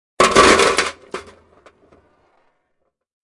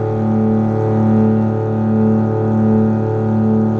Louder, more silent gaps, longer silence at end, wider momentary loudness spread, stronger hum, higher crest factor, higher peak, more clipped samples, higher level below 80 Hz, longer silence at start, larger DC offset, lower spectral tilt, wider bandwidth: about the same, -13 LUFS vs -15 LUFS; neither; first, 2.05 s vs 0 s; first, 23 LU vs 3 LU; neither; first, 18 dB vs 12 dB; about the same, 0 dBFS vs -2 dBFS; neither; about the same, -44 dBFS vs -44 dBFS; first, 0.2 s vs 0 s; neither; second, -2 dB/octave vs -11.5 dB/octave; first, 11.5 kHz vs 3.6 kHz